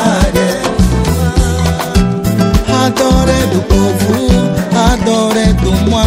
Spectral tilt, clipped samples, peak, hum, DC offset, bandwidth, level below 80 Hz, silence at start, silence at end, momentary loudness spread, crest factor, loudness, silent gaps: -5.5 dB/octave; under 0.1%; 0 dBFS; none; under 0.1%; 16.5 kHz; -18 dBFS; 0 s; 0 s; 2 LU; 10 dB; -11 LUFS; none